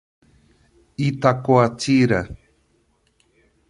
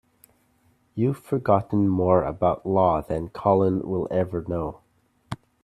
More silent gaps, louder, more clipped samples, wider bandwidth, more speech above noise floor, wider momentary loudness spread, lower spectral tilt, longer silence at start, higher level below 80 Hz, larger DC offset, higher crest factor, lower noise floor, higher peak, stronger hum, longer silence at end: neither; first, -19 LUFS vs -24 LUFS; neither; second, 11.5 kHz vs 14 kHz; about the same, 46 dB vs 43 dB; about the same, 12 LU vs 12 LU; second, -6.5 dB/octave vs -9.5 dB/octave; about the same, 1 s vs 0.95 s; about the same, -50 dBFS vs -50 dBFS; neither; about the same, 20 dB vs 20 dB; about the same, -64 dBFS vs -65 dBFS; about the same, -2 dBFS vs -4 dBFS; neither; first, 1.35 s vs 0.3 s